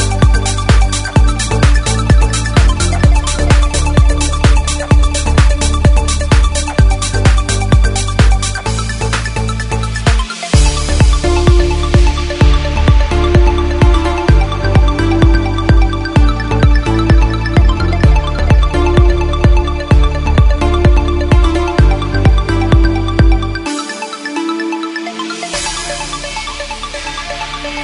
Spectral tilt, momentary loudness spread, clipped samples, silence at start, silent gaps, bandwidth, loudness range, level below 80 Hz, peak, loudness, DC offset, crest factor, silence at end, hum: -5.5 dB/octave; 8 LU; under 0.1%; 0 s; none; 11 kHz; 3 LU; -12 dBFS; 0 dBFS; -13 LUFS; under 0.1%; 10 dB; 0 s; none